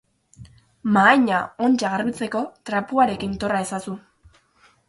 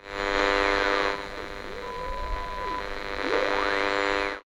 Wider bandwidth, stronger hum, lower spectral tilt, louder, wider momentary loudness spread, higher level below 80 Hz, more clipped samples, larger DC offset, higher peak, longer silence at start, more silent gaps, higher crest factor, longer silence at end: second, 11.5 kHz vs 16 kHz; neither; first, -5 dB/octave vs -3.5 dB/octave; first, -21 LUFS vs -27 LUFS; about the same, 15 LU vs 13 LU; second, -54 dBFS vs -40 dBFS; neither; neither; first, -2 dBFS vs -8 dBFS; first, 0.4 s vs 0 s; neither; about the same, 20 dB vs 20 dB; first, 0.9 s vs 0.05 s